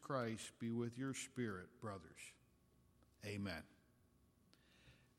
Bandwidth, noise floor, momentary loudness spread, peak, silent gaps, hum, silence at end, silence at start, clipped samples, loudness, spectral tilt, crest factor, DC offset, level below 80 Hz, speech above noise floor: 16.5 kHz; -74 dBFS; 13 LU; -28 dBFS; none; none; 0.25 s; 0 s; under 0.1%; -48 LUFS; -5 dB/octave; 20 dB; under 0.1%; -78 dBFS; 27 dB